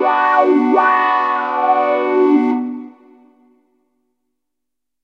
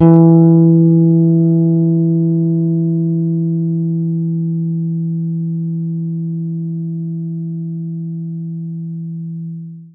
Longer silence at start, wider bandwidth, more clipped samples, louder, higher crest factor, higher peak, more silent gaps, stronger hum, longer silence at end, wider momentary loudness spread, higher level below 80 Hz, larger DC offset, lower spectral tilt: about the same, 0 s vs 0 s; first, 6.4 kHz vs 1.6 kHz; neither; about the same, -14 LUFS vs -15 LUFS; about the same, 16 dB vs 14 dB; about the same, 0 dBFS vs 0 dBFS; neither; neither; first, 2.15 s vs 0.05 s; second, 7 LU vs 15 LU; second, -90 dBFS vs -62 dBFS; neither; second, -5.5 dB/octave vs -15.5 dB/octave